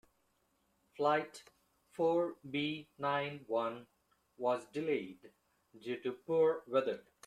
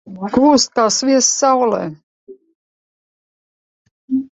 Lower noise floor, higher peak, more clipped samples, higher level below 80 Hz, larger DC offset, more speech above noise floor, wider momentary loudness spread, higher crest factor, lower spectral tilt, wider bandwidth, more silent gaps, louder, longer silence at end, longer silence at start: second, -77 dBFS vs under -90 dBFS; second, -18 dBFS vs 0 dBFS; neither; second, -82 dBFS vs -56 dBFS; neither; second, 42 dB vs over 76 dB; first, 16 LU vs 10 LU; about the same, 18 dB vs 16 dB; first, -6 dB/octave vs -3 dB/octave; first, 12 kHz vs 8.2 kHz; second, none vs 2.03-2.27 s, 2.55-3.85 s, 3.91-4.08 s; second, -36 LUFS vs -14 LUFS; first, 0.25 s vs 0.05 s; first, 1 s vs 0.05 s